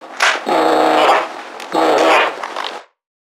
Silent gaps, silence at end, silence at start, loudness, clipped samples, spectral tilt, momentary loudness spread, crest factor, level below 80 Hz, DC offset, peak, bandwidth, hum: none; 0.4 s; 0 s; -14 LUFS; under 0.1%; -2 dB/octave; 15 LU; 16 dB; -70 dBFS; under 0.1%; 0 dBFS; 17.5 kHz; none